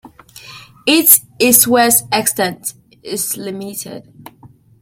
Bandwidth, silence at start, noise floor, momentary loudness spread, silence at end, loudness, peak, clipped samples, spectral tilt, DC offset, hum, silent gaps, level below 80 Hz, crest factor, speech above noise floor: 17 kHz; 0.05 s; -45 dBFS; 18 LU; 0.35 s; -12 LUFS; 0 dBFS; 0.2%; -2 dB/octave; under 0.1%; none; none; -56 dBFS; 16 dB; 30 dB